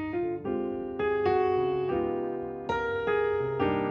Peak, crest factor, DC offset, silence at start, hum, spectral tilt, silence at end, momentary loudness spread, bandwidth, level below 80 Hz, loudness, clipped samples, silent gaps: -14 dBFS; 14 dB; under 0.1%; 0 s; none; -8 dB/octave; 0 s; 7 LU; 6.8 kHz; -54 dBFS; -29 LUFS; under 0.1%; none